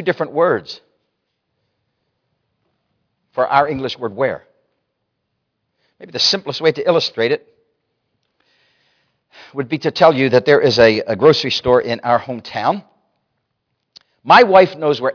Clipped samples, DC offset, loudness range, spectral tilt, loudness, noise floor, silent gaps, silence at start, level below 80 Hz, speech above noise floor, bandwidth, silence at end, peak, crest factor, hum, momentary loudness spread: under 0.1%; under 0.1%; 9 LU; -5 dB/octave; -15 LUFS; -73 dBFS; none; 0 s; -56 dBFS; 58 dB; 5.4 kHz; 0 s; 0 dBFS; 18 dB; none; 14 LU